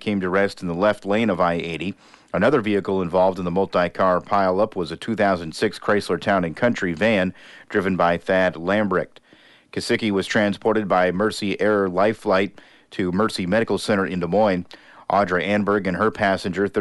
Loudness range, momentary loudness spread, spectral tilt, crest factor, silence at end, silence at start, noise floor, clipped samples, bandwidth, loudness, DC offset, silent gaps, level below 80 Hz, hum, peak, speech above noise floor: 1 LU; 7 LU; -6 dB/octave; 14 dB; 0 s; 0 s; -52 dBFS; under 0.1%; 11.5 kHz; -21 LUFS; under 0.1%; none; -54 dBFS; none; -6 dBFS; 32 dB